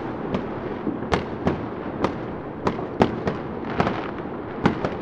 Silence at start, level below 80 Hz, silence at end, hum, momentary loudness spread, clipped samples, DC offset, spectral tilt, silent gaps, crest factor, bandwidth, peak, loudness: 0 s; -44 dBFS; 0 s; none; 8 LU; under 0.1%; under 0.1%; -7.5 dB/octave; none; 26 dB; 9.4 kHz; 0 dBFS; -26 LUFS